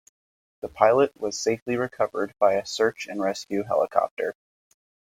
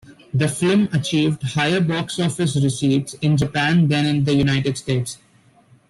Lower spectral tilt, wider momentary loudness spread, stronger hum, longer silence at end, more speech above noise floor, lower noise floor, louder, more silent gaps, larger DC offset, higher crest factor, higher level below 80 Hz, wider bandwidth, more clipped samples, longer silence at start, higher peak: second, -4 dB/octave vs -5.5 dB/octave; first, 9 LU vs 6 LU; neither; about the same, 0.85 s vs 0.75 s; first, over 66 dB vs 35 dB; first, under -90 dBFS vs -53 dBFS; second, -25 LUFS vs -19 LUFS; first, 1.62-1.66 s, 4.11-4.17 s vs none; neither; first, 22 dB vs 14 dB; second, -64 dBFS vs -50 dBFS; first, 16 kHz vs 12.5 kHz; neither; first, 0.65 s vs 0.1 s; first, -2 dBFS vs -6 dBFS